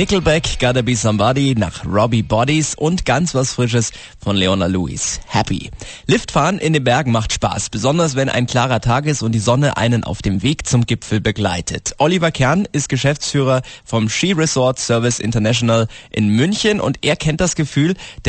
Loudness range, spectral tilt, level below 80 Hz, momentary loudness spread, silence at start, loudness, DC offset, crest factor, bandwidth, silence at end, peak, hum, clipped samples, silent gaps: 2 LU; -5 dB/octave; -36 dBFS; 5 LU; 0 s; -17 LUFS; under 0.1%; 14 dB; 8.8 kHz; 0 s; -2 dBFS; none; under 0.1%; none